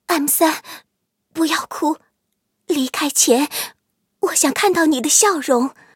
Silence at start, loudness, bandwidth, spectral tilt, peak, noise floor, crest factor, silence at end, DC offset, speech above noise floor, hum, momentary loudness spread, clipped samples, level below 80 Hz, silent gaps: 0.1 s; -17 LUFS; 17 kHz; -1 dB/octave; 0 dBFS; -73 dBFS; 18 dB; 0.25 s; under 0.1%; 55 dB; none; 14 LU; under 0.1%; -70 dBFS; none